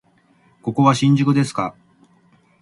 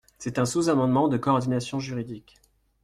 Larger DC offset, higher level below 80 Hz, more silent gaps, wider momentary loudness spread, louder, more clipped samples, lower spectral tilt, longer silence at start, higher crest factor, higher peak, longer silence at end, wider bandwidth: neither; about the same, -60 dBFS vs -58 dBFS; neither; about the same, 13 LU vs 12 LU; first, -18 LUFS vs -25 LUFS; neither; about the same, -6.5 dB/octave vs -6 dB/octave; first, 0.65 s vs 0.2 s; about the same, 18 dB vs 16 dB; first, -2 dBFS vs -10 dBFS; first, 0.9 s vs 0.65 s; second, 11.5 kHz vs 13.5 kHz